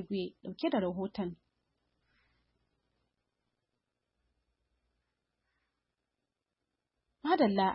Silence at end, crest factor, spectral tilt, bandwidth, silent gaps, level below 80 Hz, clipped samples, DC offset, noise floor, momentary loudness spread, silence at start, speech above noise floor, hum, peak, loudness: 0 s; 22 dB; -5 dB/octave; 5.6 kHz; none; -72 dBFS; under 0.1%; under 0.1%; -88 dBFS; 13 LU; 0 s; 56 dB; none; -16 dBFS; -34 LUFS